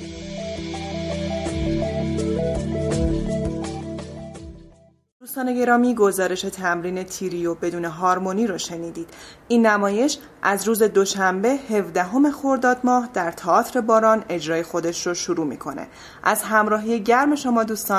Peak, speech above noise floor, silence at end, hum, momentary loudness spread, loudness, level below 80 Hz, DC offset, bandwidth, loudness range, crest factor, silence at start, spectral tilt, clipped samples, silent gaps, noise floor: -2 dBFS; 30 dB; 0 s; none; 14 LU; -21 LUFS; -40 dBFS; under 0.1%; 15.5 kHz; 5 LU; 18 dB; 0 s; -5 dB/octave; under 0.1%; 5.12-5.20 s; -51 dBFS